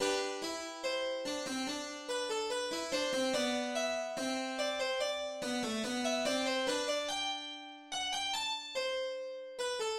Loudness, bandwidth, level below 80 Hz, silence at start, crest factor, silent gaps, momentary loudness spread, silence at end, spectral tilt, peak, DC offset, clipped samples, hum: -35 LUFS; 16 kHz; -70 dBFS; 0 s; 16 dB; none; 7 LU; 0 s; -1.5 dB/octave; -20 dBFS; under 0.1%; under 0.1%; none